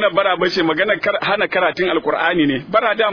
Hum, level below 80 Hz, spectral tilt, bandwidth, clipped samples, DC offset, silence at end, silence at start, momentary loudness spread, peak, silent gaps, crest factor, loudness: none; -52 dBFS; -5.5 dB/octave; 5.4 kHz; under 0.1%; under 0.1%; 0 s; 0 s; 2 LU; -2 dBFS; none; 16 dB; -17 LUFS